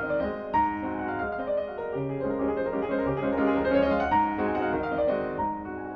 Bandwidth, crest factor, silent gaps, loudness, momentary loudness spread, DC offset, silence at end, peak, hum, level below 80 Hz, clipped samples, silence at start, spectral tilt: 6.2 kHz; 14 dB; none; -27 LUFS; 7 LU; under 0.1%; 0 s; -12 dBFS; none; -48 dBFS; under 0.1%; 0 s; -9 dB/octave